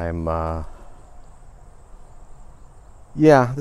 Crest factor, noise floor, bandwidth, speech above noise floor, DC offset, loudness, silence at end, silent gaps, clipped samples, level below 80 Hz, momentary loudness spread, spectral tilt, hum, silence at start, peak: 22 dB; -43 dBFS; 12 kHz; 25 dB; under 0.1%; -19 LUFS; 0 s; none; under 0.1%; -40 dBFS; 22 LU; -7.5 dB/octave; none; 0 s; -2 dBFS